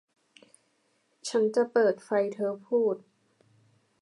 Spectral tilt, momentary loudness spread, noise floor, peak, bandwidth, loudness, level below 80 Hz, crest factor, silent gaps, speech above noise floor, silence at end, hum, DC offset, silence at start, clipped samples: -4.5 dB/octave; 8 LU; -72 dBFS; -12 dBFS; 11.5 kHz; -28 LUFS; -88 dBFS; 18 dB; none; 45 dB; 1.05 s; none; under 0.1%; 1.25 s; under 0.1%